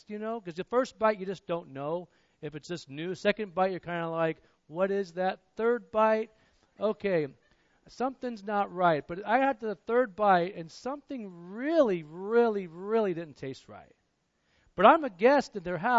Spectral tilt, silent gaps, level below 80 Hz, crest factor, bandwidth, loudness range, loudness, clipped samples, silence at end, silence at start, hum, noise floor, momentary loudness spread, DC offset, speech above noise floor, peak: -6.5 dB/octave; none; -68 dBFS; 24 dB; 8 kHz; 5 LU; -29 LUFS; under 0.1%; 0 s; 0.1 s; none; -75 dBFS; 16 LU; under 0.1%; 46 dB; -6 dBFS